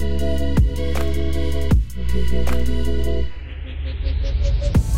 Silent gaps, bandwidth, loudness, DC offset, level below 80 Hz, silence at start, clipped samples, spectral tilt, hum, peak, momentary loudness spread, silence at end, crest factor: none; 15 kHz; -23 LUFS; 7%; -22 dBFS; 0 s; under 0.1%; -7 dB/octave; none; -6 dBFS; 8 LU; 0 s; 14 dB